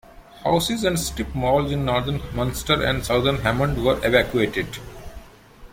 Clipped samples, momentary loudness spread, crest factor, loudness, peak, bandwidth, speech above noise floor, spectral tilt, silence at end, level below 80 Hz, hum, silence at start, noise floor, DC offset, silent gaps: under 0.1%; 10 LU; 20 dB; -22 LUFS; -2 dBFS; 16.5 kHz; 24 dB; -5 dB/octave; 0.05 s; -36 dBFS; none; 0.15 s; -45 dBFS; under 0.1%; none